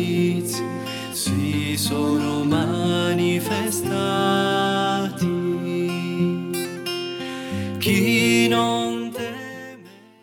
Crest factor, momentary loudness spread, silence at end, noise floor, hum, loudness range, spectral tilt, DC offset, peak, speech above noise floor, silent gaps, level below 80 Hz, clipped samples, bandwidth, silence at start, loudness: 16 dB; 11 LU; 0.25 s; -45 dBFS; none; 2 LU; -5 dB/octave; under 0.1%; -8 dBFS; 23 dB; none; -64 dBFS; under 0.1%; 19 kHz; 0 s; -22 LUFS